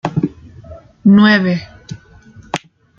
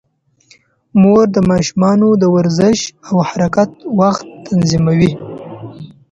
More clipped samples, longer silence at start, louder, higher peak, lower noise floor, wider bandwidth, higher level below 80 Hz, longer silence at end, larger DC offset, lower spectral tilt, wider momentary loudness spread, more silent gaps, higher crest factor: neither; second, 0.05 s vs 0.95 s; about the same, -14 LUFS vs -13 LUFS; about the same, -2 dBFS vs 0 dBFS; second, -42 dBFS vs -51 dBFS; about the same, 7.4 kHz vs 8 kHz; about the same, -48 dBFS vs -44 dBFS; first, 0.4 s vs 0.25 s; neither; about the same, -7 dB/octave vs -6.5 dB/octave; first, 25 LU vs 17 LU; neither; about the same, 14 dB vs 14 dB